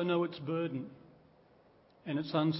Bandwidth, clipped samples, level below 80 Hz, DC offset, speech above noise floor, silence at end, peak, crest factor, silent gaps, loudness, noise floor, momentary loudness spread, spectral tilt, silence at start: 5.6 kHz; under 0.1%; -76 dBFS; under 0.1%; 30 dB; 0 s; -18 dBFS; 18 dB; none; -36 LUFS; -64 dBFS; 15 LU; -6 dB/octave; 0 s